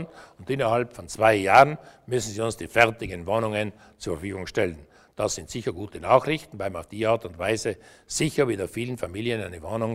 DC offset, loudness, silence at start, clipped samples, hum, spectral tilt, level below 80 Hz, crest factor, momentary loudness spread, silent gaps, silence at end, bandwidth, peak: under 0.1%; -25 LUFS; 0 s; under 0.1%; none; -4.5 dB/octave; -52 dBFS; 24 dB; 13 LU; none; 0 s; 16 kHz; -2 dBFS